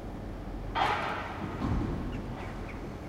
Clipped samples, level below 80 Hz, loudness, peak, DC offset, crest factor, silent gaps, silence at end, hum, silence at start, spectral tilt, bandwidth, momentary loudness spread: under 0.1%; -42 dBFS; -34 LUFS; -14 dBFS; under 0.1%; 20 dB; none; 0 s; none; 0 s; -6.5 dB/octave; 15 kHz; 11 LU